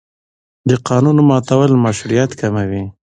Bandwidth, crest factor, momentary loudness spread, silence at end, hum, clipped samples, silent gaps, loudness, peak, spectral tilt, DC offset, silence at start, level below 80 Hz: 9.8 kHz; 14 dB; 10 LU; 0.25 s; none; under 0.1%; none; -14 LUFS; 0 dBFS; -7 dB/octave; under 0.1%; 0.65 s; -44 dBFS